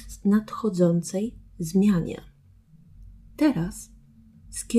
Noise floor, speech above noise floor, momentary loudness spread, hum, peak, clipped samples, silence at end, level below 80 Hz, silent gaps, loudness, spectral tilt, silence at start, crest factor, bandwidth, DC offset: -54 dBFS; 31 dB; 16 LU; none; -10 dBFS; under 0.1%; 0 s; -48 dBFS; none; -25 LUFS; -6.5 dB/octave; 0 s; 16 dB; 14 kHz; under 0.1%